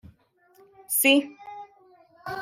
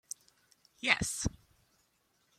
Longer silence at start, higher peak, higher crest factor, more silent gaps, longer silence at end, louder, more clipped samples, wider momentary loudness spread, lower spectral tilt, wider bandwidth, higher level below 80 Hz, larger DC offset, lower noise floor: about the same, 0.9 s vs 0.85 s; about the same, -6 dBFS vs -8 dBFS; second, 22 dB vs 30 dB; neither; second, 0 s vs 1.05 s; first, -21 LUFS vs -32 LUFS; neither; first, 24 LU vs 17 LU; about the same, -1.5 dB/octave vs -2.5 dB/octave; about the same, 16 kHz vs 16 kHz; second, -68 dBFS vs -54 dBFS; neither; second, -61 dBFS vs -74 dBFS